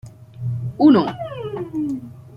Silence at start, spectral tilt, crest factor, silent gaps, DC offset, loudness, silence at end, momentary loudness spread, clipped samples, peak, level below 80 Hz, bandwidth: 0.05 s; -9 dB/octave; 18 dB; none; under 0.1%; -20 LUFS; 0 s; 16 LU; under 0.1%; -2 dBFS; -54 dBFS; 5.4 kHz